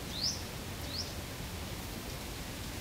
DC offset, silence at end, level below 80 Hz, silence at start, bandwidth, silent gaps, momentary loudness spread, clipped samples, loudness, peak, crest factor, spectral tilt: under 0.1%; 0 s; -48 dBFS; 0 s; 16 kHz; none; 7 LU; under 0.1%; -39 LUFS; -20 dBFS; 20 dB; -3 dB/octave